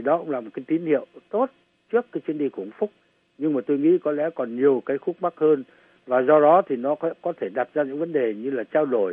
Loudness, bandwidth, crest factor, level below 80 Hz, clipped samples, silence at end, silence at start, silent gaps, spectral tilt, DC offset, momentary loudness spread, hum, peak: -23 LUFS; 3.7 kHz; 18 dB; -80 dBFS; under 0.1%; 0 s; 0 s; none; -10 dB/octave; under 0.1%; 11 LU; none; -4 dBFS